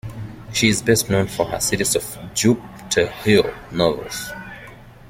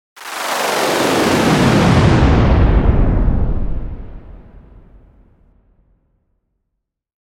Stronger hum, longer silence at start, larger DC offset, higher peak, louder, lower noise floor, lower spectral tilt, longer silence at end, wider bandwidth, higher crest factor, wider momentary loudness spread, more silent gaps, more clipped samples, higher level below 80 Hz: neither; second, 0.05 s vs 0.2 s; neither; about the same, -2 dBFS vs 0 dBFS; second, -20 LUFS vs -14 LUFS; second, -41 dBFS vs -75 dBFS; second, -4 dB/octave vs -6 dB/octave; second, 0 s vs 2.85 s; about the same, 16.5 kHz vs 17.5 kHz; first, 20 dB vs 14 dB; about the same, 16 LU vs 15 LU; neither; neither; second, -44 dBFS vs -20 dBFS